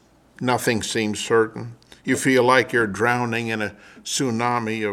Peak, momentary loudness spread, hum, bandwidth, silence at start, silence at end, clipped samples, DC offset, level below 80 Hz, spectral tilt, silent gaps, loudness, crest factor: -2 dBFS; 12 LU; none; 16.5 kHz; 0.4 s; 0 s; under 0.1%; under 0.1%; -60 dBFS; -4 dB/octave; none; -21 LUFS; 20 dB